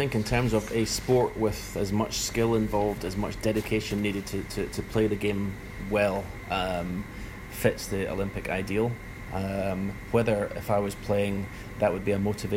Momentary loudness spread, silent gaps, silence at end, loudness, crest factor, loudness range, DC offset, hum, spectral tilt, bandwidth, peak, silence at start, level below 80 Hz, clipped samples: 8 LU; none; 0 s; -28 LUFS; 20 dB; 3 LU; under 0.1%; none; -5.5 dB/octave; 16 kHz; -8 dBFS; 0 s; -44 dBFS; under 0.1%